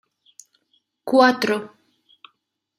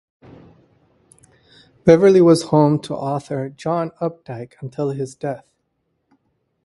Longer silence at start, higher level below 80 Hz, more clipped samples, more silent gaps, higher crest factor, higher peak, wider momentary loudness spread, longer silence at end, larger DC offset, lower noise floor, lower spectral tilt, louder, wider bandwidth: second, 1.05 s vs 1.85 s; second, -72 dBFS vs -58 dBFS; neither; neither; about the same, 22 dB vs 20 dB; about the same, -2 dBFS vs 0 dBFS; about the same, 22 LU vs 20 LU; second, 1.1 s vs 1.25 s; neither; about the same, -72 dBFS vs -71 dBFS; second, -4 dB/octave vs -7 dB/octave; about the same, -19 LUFS vs -18 LUFS; first, 15 kHz vs 11.5 kHz